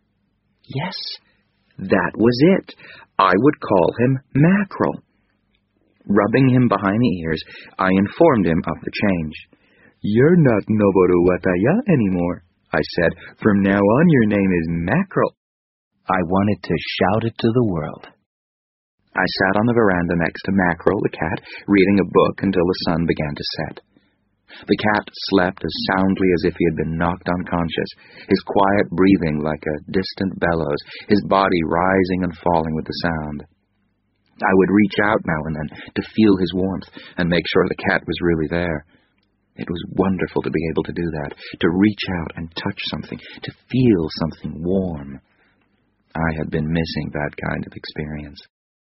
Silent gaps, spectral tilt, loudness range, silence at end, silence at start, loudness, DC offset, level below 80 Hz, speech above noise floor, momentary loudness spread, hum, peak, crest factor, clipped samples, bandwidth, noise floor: 15.37-15.91 s, 18.26-18.98 s; -5.5 dB/octave; 5 LU; 0.45 s; 0.7 s; -19 LUFS; under 0.1%; -44 dBFS; 48 dB; 13 LU; none; 0 dBFS; 20 dB; under 0.1%; 6 kHz; -67 dBFS